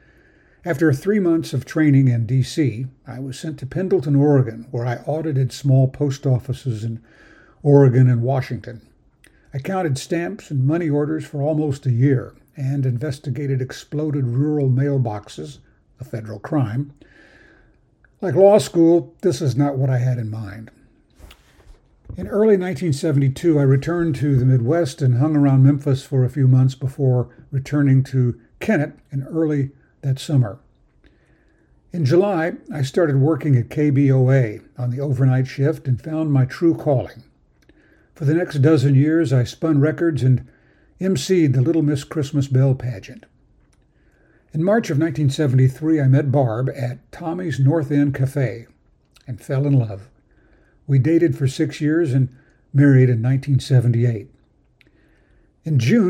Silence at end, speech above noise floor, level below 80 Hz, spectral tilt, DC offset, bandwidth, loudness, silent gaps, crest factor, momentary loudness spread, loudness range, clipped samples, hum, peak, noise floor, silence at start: 0 s; 39 dB; -52 dBFS; -8 dB/octave; under 0.1%; 9.8 kHz; -19 LUFS; none; 18 dB; 13 LU; 5 LU; under 0.1%; none; 0 dBFS; -57 dBFS; 0.65 s